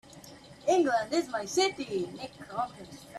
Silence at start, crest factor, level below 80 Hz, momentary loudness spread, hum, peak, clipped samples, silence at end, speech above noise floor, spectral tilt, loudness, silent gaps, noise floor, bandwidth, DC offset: 0.1 s; 16 dB; -68 dBFS; 22 LU; none; -14 dBFS; under 0.1%; 0 s; 20 dB; -3.5 dB/octave; -30 LUFS; none; -51 dBFS; 13.5 kHz; under 0.1%